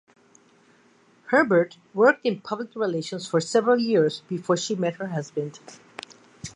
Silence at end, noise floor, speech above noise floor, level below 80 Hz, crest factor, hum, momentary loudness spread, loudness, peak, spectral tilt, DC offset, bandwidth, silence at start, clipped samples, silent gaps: 0.05 s; -59 dBFS; 35 dB; -70 dBFS; 20 dB; none; 21 LU; -24 LUFS; -4 dBFS; -5 dB/octave; under 0.1%; 10.5 kHz; 1.25 s; under 0.1%; none